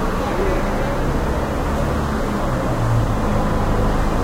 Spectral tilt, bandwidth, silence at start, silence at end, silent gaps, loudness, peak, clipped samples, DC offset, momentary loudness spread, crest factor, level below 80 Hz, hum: -7 dB/octave; 16 kHz; 0 s; 0 s; none; -21 LUFS; -6 dBFS; under 0.1%; under 0.1%; 2 LU; 12 dB; -22 dBFS; none